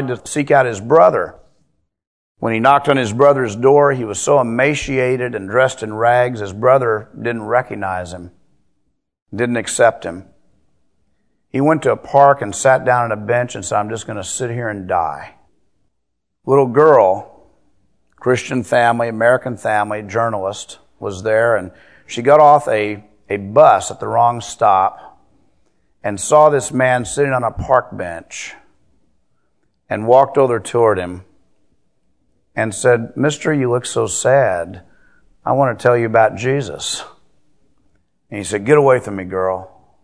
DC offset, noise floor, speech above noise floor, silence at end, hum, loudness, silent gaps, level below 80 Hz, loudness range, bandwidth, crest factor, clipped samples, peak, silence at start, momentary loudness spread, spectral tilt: 0.2%; -74 dBFS; 59 dB; 0.35 s; none; -15 LUFS; 2.07-2.35 s, 9.22-9.26 s; -50 dBFS; 6 LU; 11 kHz; 16 dB; under 0.1%; 0 dBFS; 0 s; 15 LU; -5 dB/octave